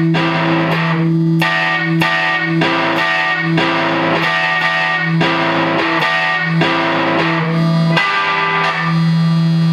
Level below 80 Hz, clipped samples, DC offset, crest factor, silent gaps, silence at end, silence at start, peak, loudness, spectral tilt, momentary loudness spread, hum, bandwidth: -54 dBFS; under 0.1%; under 0.1%; 14 dB; none; 0 s; 0 s; 0 dBFS; -14 LUFS; -6.5 dB/octave; 1 LU; none; 9.8 kHz